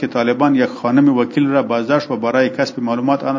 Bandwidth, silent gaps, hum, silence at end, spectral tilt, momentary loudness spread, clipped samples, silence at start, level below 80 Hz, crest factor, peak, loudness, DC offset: 7.4 kHz; none; none; 0 s; -7 dB/octave; 4 LU; under 0.1%; 0 s; -64 dBFS; 14 dB; 0 dBFS; -16 LUFS; under 0.1%